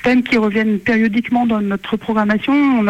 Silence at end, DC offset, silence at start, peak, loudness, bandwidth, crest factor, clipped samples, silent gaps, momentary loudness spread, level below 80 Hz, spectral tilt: 0 s; under 0.1%; 0 s; -6 dBFS; -16 LUFS; 8.4 kHz; 10 dB; under 0.1%; none; 5 LU; -48 dBFS; -7 dB/octave